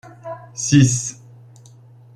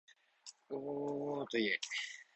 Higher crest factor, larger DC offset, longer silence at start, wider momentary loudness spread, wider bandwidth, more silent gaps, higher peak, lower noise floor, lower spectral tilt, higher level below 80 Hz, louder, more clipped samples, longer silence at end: about the same, 20 dB vs 18 dB; neither; about the same, 0.05 s vs 0.1 s; about the same, 21 LU vs 20 LU; first, 12 kHz vs 8.2 kHz; neither; first, -2 dBFS vs -22 dBFS; second, -45 dBFS vs -60 dBFS; first, -5 dB/octave vs -3.5 dB/octave; first, -52 dBFS vs -84 dBFS; first, -17 LUFS vs -39 LUFS; neither; first, 1 s vs 0.1 s